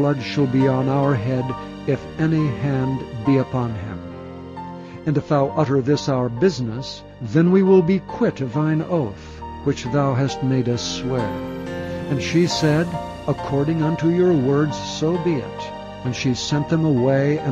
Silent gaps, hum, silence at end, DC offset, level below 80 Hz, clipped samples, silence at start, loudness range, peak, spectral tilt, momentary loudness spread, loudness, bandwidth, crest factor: none; none; 0 s; under 0.1%; -46 dBFS; under 0.1%; 0 s; 4 LU; -4 dBFS; -7 dB/octave; 13 LU; -21 LUFS; 9.2 kHz; 16 dB